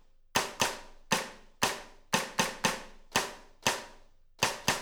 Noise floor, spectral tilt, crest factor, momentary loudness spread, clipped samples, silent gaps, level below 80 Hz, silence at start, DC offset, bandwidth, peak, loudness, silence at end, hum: -56 dBFS; -1.5 dB/octave; 24 dB; 12 LU; under 0.1%; none; -56 dBFS; 0.35 s; under 0.1%; over 20 kHz; -10 dBFS; -32 LUFS; 0 s; none